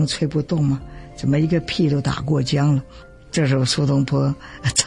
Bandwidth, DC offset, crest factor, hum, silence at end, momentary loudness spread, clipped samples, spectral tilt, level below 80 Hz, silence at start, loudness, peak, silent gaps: 11.5 kHz; under 0.1%; 18 dB; none; 0 s; 7 LU; under 0.1%; -5.5 dB/octave; -42 dBFS; 0 s; -20 LUFS; -2 dBFS; none